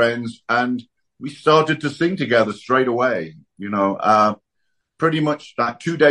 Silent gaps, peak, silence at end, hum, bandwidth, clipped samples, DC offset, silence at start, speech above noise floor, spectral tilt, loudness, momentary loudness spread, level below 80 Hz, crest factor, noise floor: none; -2 dBFS; 0 s; none; 11 kHz; under 0.1%; under 0.1%; 0 s; 55 dB; -6 dB/octave; -19 LUFS; 13 LU; -64 dBFS; 18 dB; -74 dBFS